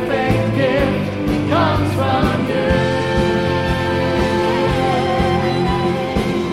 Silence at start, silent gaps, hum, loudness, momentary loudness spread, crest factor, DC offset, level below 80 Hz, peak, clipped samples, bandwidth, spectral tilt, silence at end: 0 s; none; none; -17 LUFS; 3 LU; 14 dB; 0.3%; -32 dBFS; -2 dBFS; under 0.1%; 15.5 kHz; -6.5 dB/octave; 0 s